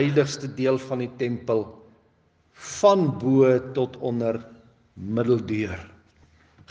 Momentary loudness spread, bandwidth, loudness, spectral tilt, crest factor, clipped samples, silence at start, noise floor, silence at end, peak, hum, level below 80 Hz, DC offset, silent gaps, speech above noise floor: 16 LU; 9.6 kHz; -24 LUFS; -6.5 dB/octave; 20 dB; under 0.1%; 0 s; -63 dBFS; 0.85 s; -6 dBFS; none; -64 dBFS; under 0.1%; none; 40 dB